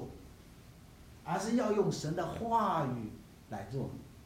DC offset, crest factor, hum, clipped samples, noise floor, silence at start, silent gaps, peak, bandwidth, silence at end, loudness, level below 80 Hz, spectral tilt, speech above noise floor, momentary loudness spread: under 0.1%; 18 dB; none; under 0.1%; -55 dBFS; 0 s; none; -18 dBFS; 16 kHz; 0 s; -34 LUFS; -60 dBFS; -6 dB/octave; 22 dB; 25 LU